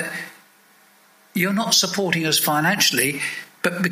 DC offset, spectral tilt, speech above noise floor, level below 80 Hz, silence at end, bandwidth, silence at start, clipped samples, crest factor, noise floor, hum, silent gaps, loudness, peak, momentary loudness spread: under 0.1%; -2.5 dB/octave; 34 dB; -68 dBFS; 0 s; 16 kHz; 0 s; under 0.1%; 20 dB; -54 dBFS; none; none; -19 LUFS; -2 dBFS; 12 LU